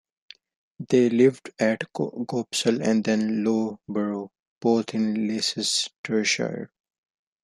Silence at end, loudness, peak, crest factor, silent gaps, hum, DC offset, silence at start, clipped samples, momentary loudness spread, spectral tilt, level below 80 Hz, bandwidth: 0.75 s; -24 LUFS; -6 dBFS; 18 dB; 4.42-4.61 s, 5.98-6.04 s; none; under 0.1%; 0.8 s; under 0.1%; 9 LU; -4 dB/octave; -70 dBFS; 13 kHz